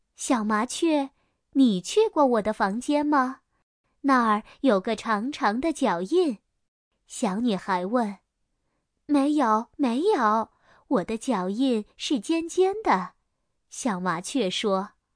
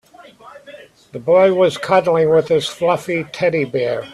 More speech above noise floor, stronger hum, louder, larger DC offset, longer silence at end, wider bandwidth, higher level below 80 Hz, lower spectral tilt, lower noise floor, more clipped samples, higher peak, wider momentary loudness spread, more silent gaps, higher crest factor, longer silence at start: first, 52 dB vs 26 dB; neither; second, -25 LUFS vs -16 LUFS; neither; first, 0.3 s vs 0 s; second, 10.5 kHz vs 13 kHz; about the same, -62 dBFS vs -58 dBFS; about the same, -4.5 dB/octave vs -5.5 dB/octave; first, -76 dBFS vs -42 dBFS; neither; second, -8 dBFS vs -2 dBFS; about the same, 8 LU vs 8 LU; first, 3.63-3.84 s, 6.68-6.91 s vs none; about the same, 16 dB vs 16 dB; second, 0.2 s vs 0.45 s